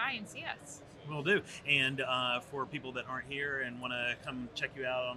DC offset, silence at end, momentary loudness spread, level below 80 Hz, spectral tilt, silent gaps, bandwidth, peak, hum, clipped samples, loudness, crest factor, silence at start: under 0.1%; 0 s; 12 LU; -68 dBFS; -4 dB/octave; none; 13.5 kHz; -14 dBFS; none; under 0.1%; -34 LUFS; 22 dB; 0 s